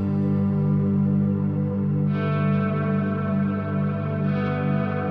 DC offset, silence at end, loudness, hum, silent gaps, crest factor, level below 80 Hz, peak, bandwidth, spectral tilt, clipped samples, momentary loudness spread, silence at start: under 0.1%; 0 s; -23 LUFS; 50 Hz at -40 dBFS; none; 10 dB; -56 dBFS; -12 dBFS; 4.7 kHz; -11 dB/octave; under 0.1%; 3 LU; 0 s